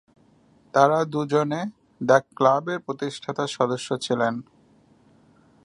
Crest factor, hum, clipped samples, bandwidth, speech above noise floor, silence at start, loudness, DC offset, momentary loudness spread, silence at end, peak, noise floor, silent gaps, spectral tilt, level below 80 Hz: 22 dB; none; under 0.1%; 11.5 kHz; 35 dB; 0.75 s; -23 LUFS; under 0.1%; 11 LU; 1.25 s; -2 dBFS; -58 dBFS; none; -5.5 dB/octave; -70 dBFS